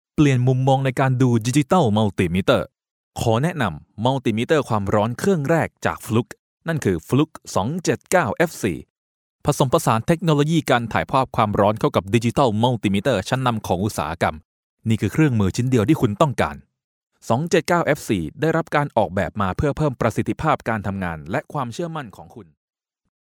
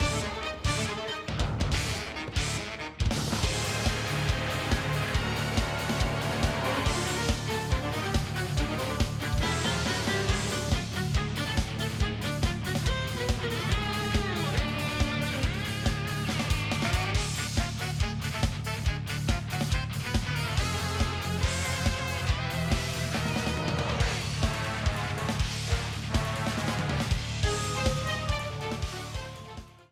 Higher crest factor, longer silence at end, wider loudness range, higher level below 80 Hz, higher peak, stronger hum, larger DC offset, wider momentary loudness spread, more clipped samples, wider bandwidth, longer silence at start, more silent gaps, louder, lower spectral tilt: about the same, 20 dB vs 16 dB; first, 0.8 s vs 0.2 s; about the same, 3 LU vs 1 LU; second, -46 dBFS vs -36 dBFS; first, 0 dBFS vs -12 dBFS; neither; neither; first, 8 LU vs 3 LU; neither; about the same, 18 kHz vs 17 kHz; first, 0.2 s vs 0 s; first, 2.91-3.11 s, 6.39-6.57 s, 8.90-9.39 s, 14.45-14.77 s, 16.84-17.07 s vs none; first, -21 LUFS vs -30 LUFS; first, -6 dB/octave vs -4.5 dB/octave